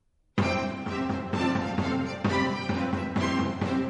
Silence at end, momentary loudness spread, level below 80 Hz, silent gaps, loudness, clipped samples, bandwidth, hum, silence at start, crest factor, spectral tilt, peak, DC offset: 0 s; 4 LU; -52 dBFS; none; -28 LUFS; under 0.1%; 10.5 kHz; none; 0.35 s; 16 dB; -6.5 dB/octave; -12 dBFS; under 0.1%